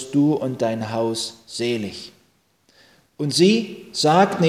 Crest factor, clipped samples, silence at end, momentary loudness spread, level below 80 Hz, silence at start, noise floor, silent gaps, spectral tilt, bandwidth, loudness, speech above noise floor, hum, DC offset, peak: 20 dB; under 0.1%; 0 s; 13 LU; -62 dBFS; 0 s; -62 dBFS; none; -5 dB/octave; 15.5 kHz; -21 LUFS; 42 dB; none; under 0.1%; -2 dBFS